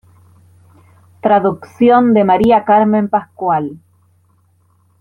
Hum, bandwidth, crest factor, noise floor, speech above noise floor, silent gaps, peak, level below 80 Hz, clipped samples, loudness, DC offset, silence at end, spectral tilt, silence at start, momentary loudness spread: none; 6.2 kHz; 14 dB; -55 dBFS; 43 dB; none; 0 dBFS; -48 dBFS; under 0.1%; -13 LUFS; under 0.1%; 1.25 s; -8.5 dB/octave; 1.25 s; 9 LU